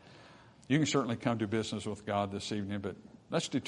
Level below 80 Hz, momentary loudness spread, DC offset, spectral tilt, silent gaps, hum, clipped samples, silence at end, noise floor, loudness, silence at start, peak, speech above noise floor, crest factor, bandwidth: -70 dBFS; 9 LU; under 0.1%; -5 dB/octave; none; none; under 0.1%; 0 s; -57 dBFS; -34 LUFS; 0.05 s; -14 dBFS; 23 dB; 22 dB; 11 kHz